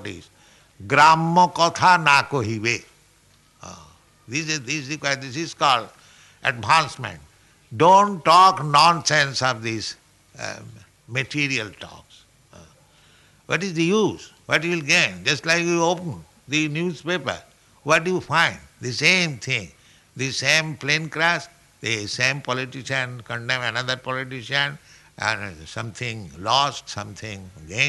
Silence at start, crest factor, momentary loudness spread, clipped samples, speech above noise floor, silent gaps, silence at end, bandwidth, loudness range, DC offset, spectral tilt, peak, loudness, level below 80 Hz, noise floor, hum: 0 s; 20 dB; 18 LU; under 0.1%; 36 dB; none; 0 s; 12 kHz; 9 LU; under 0.1%; -3.5 dB/octave; -2 dBFS; -20 LUFS; -60 dBFS; -57 dBFS; none